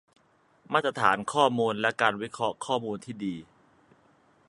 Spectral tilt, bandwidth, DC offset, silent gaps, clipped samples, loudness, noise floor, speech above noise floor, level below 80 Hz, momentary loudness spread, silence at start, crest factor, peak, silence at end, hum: -4.5 dB/octave; 11.5 kHz; under 0.1%; none; under 0.1%; -27 LUFS; -64 dBFS; 37 dB; -70 dBFS; 11 LU; 0.7 s; 24 dB; -6 dBFS; 1.05 s; none